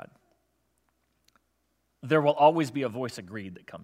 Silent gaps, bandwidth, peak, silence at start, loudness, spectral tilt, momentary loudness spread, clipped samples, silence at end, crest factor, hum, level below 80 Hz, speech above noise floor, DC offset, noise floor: none; 15 kHz; -6 dBFS; 2.05 s; -25 LUFS; -6.5 dB/octave; 20 LU; under 0.1%; 0 s; 22 dB; none; -78 dBFS; 49 dB; under 0.1%; -75 dBFS